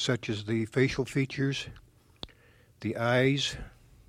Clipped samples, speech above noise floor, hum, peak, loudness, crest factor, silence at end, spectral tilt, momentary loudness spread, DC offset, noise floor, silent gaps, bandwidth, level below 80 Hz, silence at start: under 0.1%; 31 dB; none; -12 dBFS; -29 LUFS; 18 dB; 0.4 s; -5.5 dB/octave; 21 LU; under 0.1%; -60 dBFS; none; 13.5 kHz; -54 dBFS; 0 s